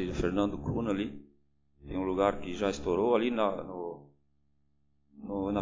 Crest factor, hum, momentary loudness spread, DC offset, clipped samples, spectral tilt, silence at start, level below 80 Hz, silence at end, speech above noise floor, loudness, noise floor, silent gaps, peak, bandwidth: 20 dB; none; 13 LU; under 0.1%; under 0.1%; -6.5 dB/octave; 0 s; -50 dBFS; 0 s; 44 dB; -32 LUFS; -74 dBFS; none; -12 dBFS; 7.6 kHz